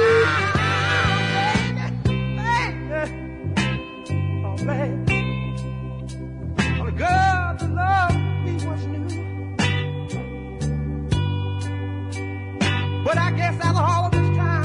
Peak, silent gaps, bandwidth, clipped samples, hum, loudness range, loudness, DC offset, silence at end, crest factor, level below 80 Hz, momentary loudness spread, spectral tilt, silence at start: -6 dBFS; none; 10.5 kHz; under 0.1%; none; 4 LU; -23 LUFS; under 0.1%; 0 s; 16 dB; -38 dBFS; 10 LU; -6 dB/octave; 0 s